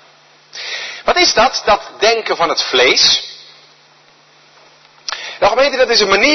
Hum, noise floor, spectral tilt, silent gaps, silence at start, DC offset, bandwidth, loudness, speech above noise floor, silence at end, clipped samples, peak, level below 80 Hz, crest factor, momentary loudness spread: none; -48 dBFS; -1 dB/octave; none; 0.55 s; under 0.1%; 6.4 kHz; -12 LUFS; 36 dB; 0 s; under 0.1%; 0 dBFS; -44 dBFS; 16 dB; 15 LU